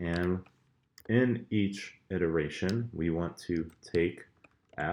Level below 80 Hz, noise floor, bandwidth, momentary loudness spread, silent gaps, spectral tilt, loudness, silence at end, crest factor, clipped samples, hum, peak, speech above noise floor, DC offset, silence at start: -56 dBFS; -62 dBFS; 18 kHz; 9 LU; none; -7 dB/octave; -32 LUFS; 0 s; 20 dB; under 0.1%; none; -12 dBFS; 31 dB; under 0.1%; 0 s